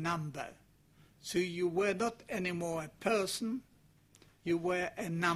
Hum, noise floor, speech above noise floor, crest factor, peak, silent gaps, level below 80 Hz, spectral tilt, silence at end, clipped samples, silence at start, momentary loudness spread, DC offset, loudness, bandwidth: none; -65 dBFS; 30 dB; 20 dB; -16 dBFS; none; -68 dBFS; -5 dB/octave; 0 s; under 0.1%; 0 s; 11 LU; under 0.1%; -36 LUFS; 15.5 kHz